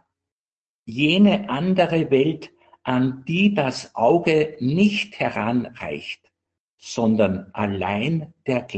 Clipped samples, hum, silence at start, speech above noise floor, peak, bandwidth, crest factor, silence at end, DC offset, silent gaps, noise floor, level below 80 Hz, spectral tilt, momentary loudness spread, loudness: under 0.1%; none; 0.85 s; over 69 dB; -4 dBFS; 8.6 kHz; 18 dB; 0 s; under 0.1%; 6.60-6.78 s; under -90 dBFS; -60 dBFS; -6.5 dB/octave; 13 LU; -21 LUFS